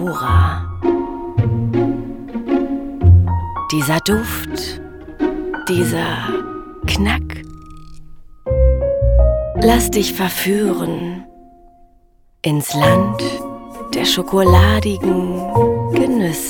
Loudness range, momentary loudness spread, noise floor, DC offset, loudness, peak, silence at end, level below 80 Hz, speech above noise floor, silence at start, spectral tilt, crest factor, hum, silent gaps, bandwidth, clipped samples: 5 LU; 13 LU; -51 dBFS; under 0.1%; -17 LUFS; 0 dBFS; 0 s; -26 dBFS; 36 dB; 0 s; -5.5 dB/octave; 16 dB; none; none; over 20 kHz; under 0.1%